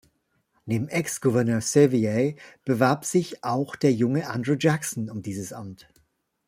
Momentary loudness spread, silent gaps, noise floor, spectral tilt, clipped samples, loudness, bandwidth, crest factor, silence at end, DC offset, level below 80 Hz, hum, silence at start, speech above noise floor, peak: 13 LU; none; -70 dBFS; -6 dB/octave; under 0.1%; -24 LUFS; 16 kHz; 20 dB; 0.7 s; under 0.1%; -64 dBFS; none; 0.65 s; 46 dB; -4 dBFS